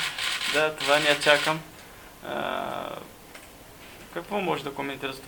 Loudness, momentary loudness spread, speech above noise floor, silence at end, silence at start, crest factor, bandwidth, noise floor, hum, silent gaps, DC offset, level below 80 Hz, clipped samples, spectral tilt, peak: -25 LUFS; 25 LU; 21 dB; 0 s; 0 s; 26 dB; 19 kHz; -47 dBFS; none; none; under 0.1%; -58 dBFS; under 0.1%; -2.5 dB/octave; -2 dBFS